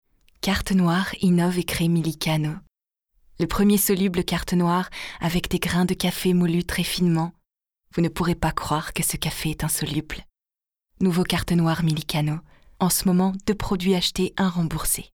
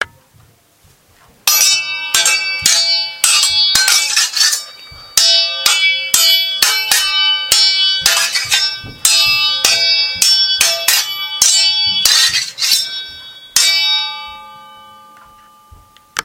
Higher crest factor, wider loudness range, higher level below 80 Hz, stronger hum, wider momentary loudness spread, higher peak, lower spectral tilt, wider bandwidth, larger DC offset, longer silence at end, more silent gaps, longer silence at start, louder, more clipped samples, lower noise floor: first, 20 dB vs 14 dB; about the same, 3 LU vs 3 LU; first, -42 dBFS vs -52 dBFS; neither; about the same, 7 LU vs 8 LU; second, -4 dBFS vs 0 dBFS; first, -5 dB/octave vs 3 dB/octave; about the same, 19 kHz vs over 20 kHz; neither; about the same, 0.1 s vs 0 s; neither; first, 0.45 s vs 0 s; second, -23 LUFS vs -10 LUFS; second, under 0.1% vs 0.1%; first, under -90 dBFS vs -50 dBFS